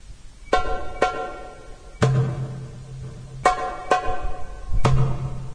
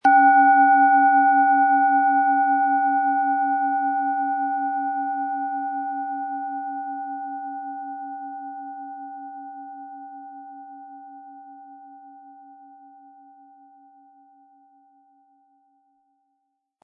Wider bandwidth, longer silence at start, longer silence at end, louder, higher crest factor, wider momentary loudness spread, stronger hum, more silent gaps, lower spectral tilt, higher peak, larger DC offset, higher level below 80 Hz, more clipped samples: first, 10.5 kHz vs 3.2 kHz; about the same, 0 s vs 0.05 s; second, 0 s vs 4.5 s; second, -24 LUFS vs -20 LUFS; first, 22 dB vs 16 dB; second, 17 LU vs 25 LU; neither; neither; about the same, -6 dB/octave vs -5 dB/octave; first, -2 dBFS vs -6 dBFS; neither; first, -32 dBFS vs -90 dBFS; neither